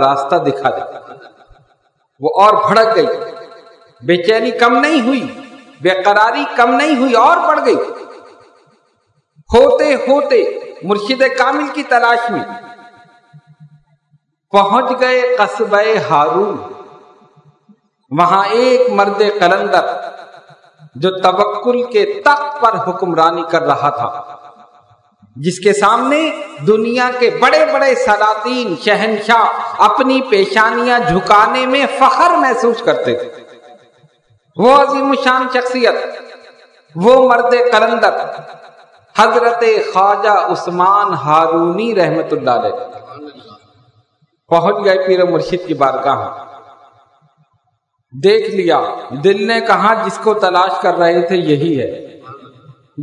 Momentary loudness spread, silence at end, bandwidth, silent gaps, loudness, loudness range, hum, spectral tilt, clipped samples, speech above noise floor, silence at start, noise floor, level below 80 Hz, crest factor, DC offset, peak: 12 LU; 0 s; 12 kHz; none; -12 LUFS; 4 LU; none; -5 dB/octave; 0.3%; 53 dB; 0 s; -65 dBFS; -52 dBFS; 14 dB; under 0.1%; 0 dBFS